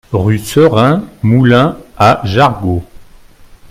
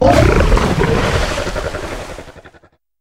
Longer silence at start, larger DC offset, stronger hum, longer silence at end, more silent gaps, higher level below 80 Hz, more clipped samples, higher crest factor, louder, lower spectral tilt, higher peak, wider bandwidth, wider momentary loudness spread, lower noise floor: about the same, 0.1 s vs 0 s; second, under 0.1% vs 1%; neither; first, 0.65 s vs 0.45 s; neither; second, -38 dBFS vs -20 dBFS; first, 0.1% vs under 0.1%; about the same, 12 dB vs 14 dB; first, -11 LUFS vs -15 LUFS; about the same, -7 dB/octave vs -6 dB/octave; about the same, 0 dBFS vs 0 dBFS; about the same, 16 kHz vs 16 kHz; second, 8 LU vs 17 LU; second, -38 dBFS vs -50 dBFS